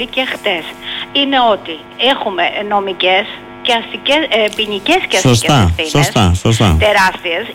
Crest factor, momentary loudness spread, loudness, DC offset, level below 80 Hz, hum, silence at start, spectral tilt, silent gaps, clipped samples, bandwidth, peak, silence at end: 10 dB; 8 LU; -13 LUFS; under 0.1%; -30 dBFS; none; 0 s; -4.5 dB/octave; none; under 0.1%; 17 kHz; -2 dBFS; 0 s